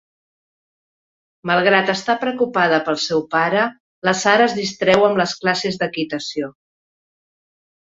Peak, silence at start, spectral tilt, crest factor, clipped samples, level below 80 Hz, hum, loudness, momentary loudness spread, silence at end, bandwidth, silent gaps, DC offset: 0 dBFS; 1.45 s; -4 dB/octave; 20 dB; under 0.1%; -62 dBFS; none; -18 LUFS; 9 LU; 1.35 s; 8 kHz; 3.80-4.02 s; under 0.1%